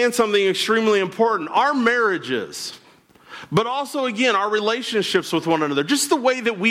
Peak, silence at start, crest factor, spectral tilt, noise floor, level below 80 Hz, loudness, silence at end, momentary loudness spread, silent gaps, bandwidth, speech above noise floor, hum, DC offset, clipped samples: -6 dBFS; 0 s; 14 dB; -3.5 dB/octave; -52 dBFS; -64 dBFS; -20 LUFS; 0 s; 7 LU; none; 16.5 kHz; 32 dB; none; under 0.1%; under 0.1%